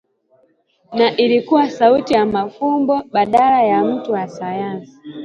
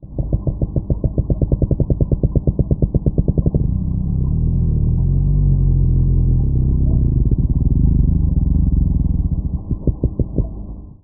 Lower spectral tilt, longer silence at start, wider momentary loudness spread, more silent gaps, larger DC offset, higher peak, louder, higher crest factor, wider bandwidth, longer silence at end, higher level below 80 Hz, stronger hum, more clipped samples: second, -6.5 dB/octave vs -21.5 dB/octave; first, 0.9 s vs 0 s; first, 11 LU vs 6 LU; neither; neither; about the same, 0 dBFS vs -2 dBFS; about the same, -16 LUFS vs -18 LUFS; about the same, 16 dB vs 14 dB; first, 8.8 kHz vs 1.2 kHz; about the same, 0 s vs 0.1 s; second, -58 dBFS vs -18 dBFS; neither; neither